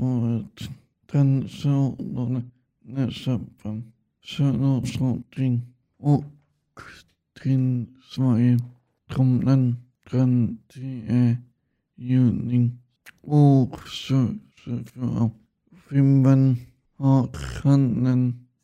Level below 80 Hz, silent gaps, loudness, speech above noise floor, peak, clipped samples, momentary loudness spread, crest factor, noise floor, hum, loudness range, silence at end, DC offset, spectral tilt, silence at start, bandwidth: -52 dBFS; none; -23 LUFS; 37 dB; -4 dBFS; under 0.1%; 15 LU; 18 dB; -59 dBFS; none; 5 LU; 0.25 s; under 0.1%; -8.5 dB/octave; 0 s; 9 kHz